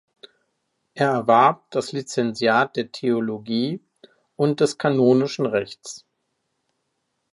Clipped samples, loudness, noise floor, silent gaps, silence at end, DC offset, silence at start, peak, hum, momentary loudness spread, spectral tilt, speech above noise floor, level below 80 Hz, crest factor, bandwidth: under 0.1%; -21 LUFS; -75 dBFS; none; 1.35 s; under 0.1%; 0.95 s; -4 dBFS; none; 12 LU; -5.5 dB/octave; 54 dB; -70 dBFS; 20 dB; 11.5 kHz